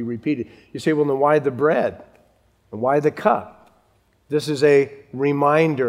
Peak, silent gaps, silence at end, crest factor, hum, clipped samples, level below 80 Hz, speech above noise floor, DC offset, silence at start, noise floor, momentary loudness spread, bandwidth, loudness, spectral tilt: -2 dBFS; none; 0 s; 18 dB; none; under 0.1%; -64 dBFS; 42 dB; under 0.1%; 0 s; -61 dBFS; 10 LU; 13 kHz; -20 LUFS; -7 dB/octave